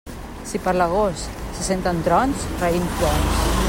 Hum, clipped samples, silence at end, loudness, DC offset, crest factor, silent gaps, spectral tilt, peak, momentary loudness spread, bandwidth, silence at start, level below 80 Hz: none; under 0.1%; 0 s; -21 LUFS; under 0.1%; 16 dB; none; -5 dB/octave; -6 dBFS; 11 LU; 16.5 kHz; 0.05 s; -30 dBFS